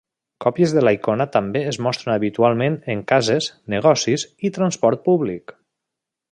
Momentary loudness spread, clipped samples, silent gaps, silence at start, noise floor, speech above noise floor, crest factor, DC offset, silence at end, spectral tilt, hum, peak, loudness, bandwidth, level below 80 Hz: 7 LU; under 0.1%; none; 0.4 s; -83 dBFS; 65 dB; 18 dB; under 0.1%; 0.95 s; -5.5 dB/octave; none; -2 dBFS; -19 LUFS; 10.5 kHz; -58 dBFS